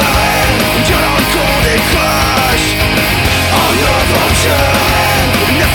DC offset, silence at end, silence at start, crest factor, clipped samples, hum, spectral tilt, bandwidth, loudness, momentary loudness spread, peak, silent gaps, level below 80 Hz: under 0.1%; 0 s; 0 s; 10 dB; under 0.1%; none; -3.5 dB/octave; over 20 kHz; -10 LUFS; 1 LU; 0 dBFS; none; -22 dBFS